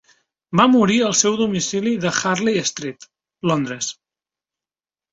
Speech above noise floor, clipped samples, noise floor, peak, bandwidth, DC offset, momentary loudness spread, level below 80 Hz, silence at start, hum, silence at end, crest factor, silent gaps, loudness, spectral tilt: over 72 dB; under 0.1%; under -90 dBFS; -2 dBFS; 8 kHz; under 0.1%; 12 LU; -58 dBFS; 0.5 s; none; 1.2 s; 18 dB; none; -18 LUFS; -3.5 dB/octave